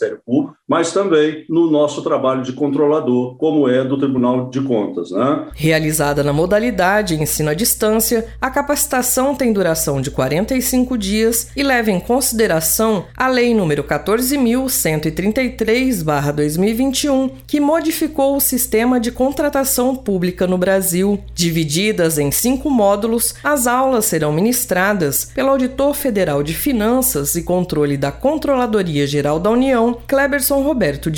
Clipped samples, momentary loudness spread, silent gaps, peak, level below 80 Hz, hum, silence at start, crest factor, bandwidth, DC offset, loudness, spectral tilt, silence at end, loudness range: under 0.1%; 4 LU; none; -2 dBFS; -38 dBFS; none; 0 s; 14 dB; over 20 kHz; under 0.1%; -16 LUFS; -4.5 dB/octave; 0 s; 1 LU